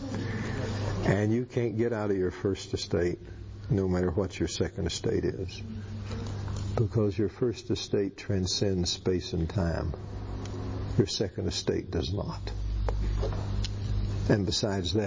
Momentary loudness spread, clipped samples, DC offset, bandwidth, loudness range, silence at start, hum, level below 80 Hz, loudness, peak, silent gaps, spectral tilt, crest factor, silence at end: 9 LU; under 0.1%; under 0.1%; 7.6 kHz; 2 LU; 0 s; none; -38 dBFS; -31 LUFS; -12 dBFS; none; -6 dB/octave; 18 dB; 0 s